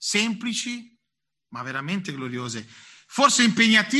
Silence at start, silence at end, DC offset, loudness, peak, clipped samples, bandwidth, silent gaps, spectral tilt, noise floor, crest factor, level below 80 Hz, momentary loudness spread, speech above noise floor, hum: 0 s; 0 s; under 0.1%; -22 LUFS; -4 dBFS; under 0.1%; 12.5 kHz; none; -2.5 dB/octave; -84 dBFS; 20 dB; -70 dBFS; 18 LU; 61 dB; none